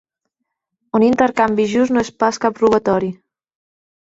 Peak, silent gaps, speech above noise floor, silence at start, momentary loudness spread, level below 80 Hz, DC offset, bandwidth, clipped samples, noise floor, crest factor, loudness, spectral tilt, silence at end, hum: -2 dBFS; none; 61 dB; 0.95 s; 5 LU; -54 dBFS; under 0.1%; 8 kHz; under 0.1%; -77 dBFS; 16 dB; -16 LUFS; -5.5 dB/octave; 1 s; none